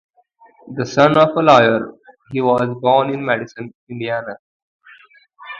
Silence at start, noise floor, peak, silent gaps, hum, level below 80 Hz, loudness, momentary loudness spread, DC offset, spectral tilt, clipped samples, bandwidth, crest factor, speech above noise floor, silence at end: 0.65 s; -52 dBFS; 0 dBFS; 3.75-3.87 s, 4.39-4.79 s; none; -58 dBFS; -16 LUFS; 21 LU; under 0.1%; -6 dB/octave; under 0.1%; 7.4 kHz; 18 dB; 36 dB; 0 s